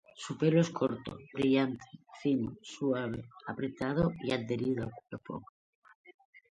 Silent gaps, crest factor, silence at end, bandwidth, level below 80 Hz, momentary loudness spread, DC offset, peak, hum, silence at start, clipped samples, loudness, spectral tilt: 5.49-5.82 s, 5.95-6.04 s, 6.14-6.19 s, 6.25-6.33 s; 18 dB; 0.2 s; 10 kHz; -62 dBFS; 15 LU; under 0.1%; -14 dBFS; none; 0.15 s; under 0.1%; -33 LUFS; -7 dB/octave